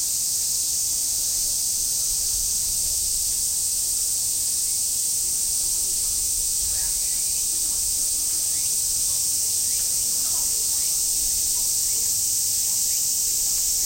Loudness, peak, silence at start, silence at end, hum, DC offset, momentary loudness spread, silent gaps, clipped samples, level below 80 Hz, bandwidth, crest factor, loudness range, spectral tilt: -20 LUFS; -10 dBFS; 0 s; 0 s; none; under 0.1%; 1 LU; none; under 0.1%; -46 dBFS; 16.5 kHz; 14 dB; 1 LU; 1.5 dB/octave